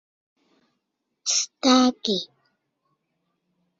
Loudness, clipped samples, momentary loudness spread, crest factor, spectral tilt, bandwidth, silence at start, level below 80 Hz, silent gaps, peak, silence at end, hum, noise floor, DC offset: -22 LUFS; under 0.1%; 12 LU; 22 dB; -2 dB/octave; 7.8 kHz; 1.25 s; -70 dBFS; none; -6 dBFS; 1.55 s; none; -78 dBFS; under 0.1%